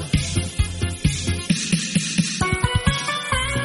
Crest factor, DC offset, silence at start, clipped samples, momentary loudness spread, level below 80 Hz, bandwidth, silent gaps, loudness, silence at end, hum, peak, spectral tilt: 18 dB; under 0.1%; 0 s; under 0.1%; 4 LU; -30 dBFS; 11.5 kHz; none; -22 LUFS; 0 s; none; -4 dBFS; -4 dB/octave